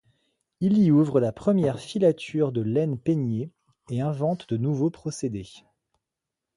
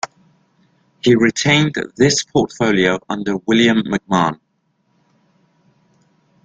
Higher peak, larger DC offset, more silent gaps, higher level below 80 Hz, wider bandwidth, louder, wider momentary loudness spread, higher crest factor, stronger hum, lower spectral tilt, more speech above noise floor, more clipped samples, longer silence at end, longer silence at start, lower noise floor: second, -8 dBFS vs 0 dBFS; neither; neither; second, -60 dBFS vs -52 dBFS; first, 11.5 kHz vs 9.4 kHz; second, -25 LUFS vs -16 LUFS; first, 12 LU vs 8 LU; about the same, 18 dB vs 18 dB; neither; first, -8 dB/octave vs -4.5 dB/octave; first, 63 dB vs 50 dB; neither; second, 1 s vs 2.1 s; first, 0.6 s vs 0.05 s; first, -86 dBFS vs -65 dBFS